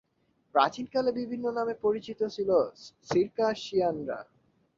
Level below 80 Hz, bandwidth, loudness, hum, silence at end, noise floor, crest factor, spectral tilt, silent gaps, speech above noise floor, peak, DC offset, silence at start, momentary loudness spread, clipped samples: -66 dBFS; 7.6 kHz; -29 LUFS; none; 0.55 s; -72 dBFS; 22 dB; -5.5 dB/octave; none; 43 dB; -8 dBFS; under 0.1%; 0.55 s; 9 LU; under 0.1%